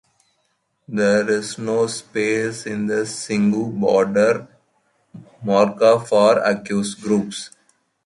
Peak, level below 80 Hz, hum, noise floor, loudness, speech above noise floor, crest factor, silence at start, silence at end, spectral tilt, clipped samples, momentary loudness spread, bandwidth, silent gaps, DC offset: -2 dBFS; -62 dBFS; none; -69 dBFS; -19 LUFS; 50 dB; 18 dB; 0.9 s; 0.55 s; -5 dB/octave; under 0.1%; 10 LU; 11.5 kHz; none; under 0.1%